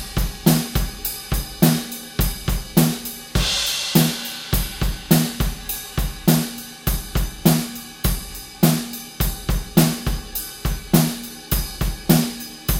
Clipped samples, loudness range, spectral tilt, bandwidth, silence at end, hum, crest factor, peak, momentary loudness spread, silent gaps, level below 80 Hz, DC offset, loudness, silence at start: under 0.1%; 2 LU; -4.5 dB/octave; 17 kHz; 0 s; none; 20 dB; 0 dBFS; 9 LU; none; -28 dBFS; under 0.1%; -21 LUFS; 0 s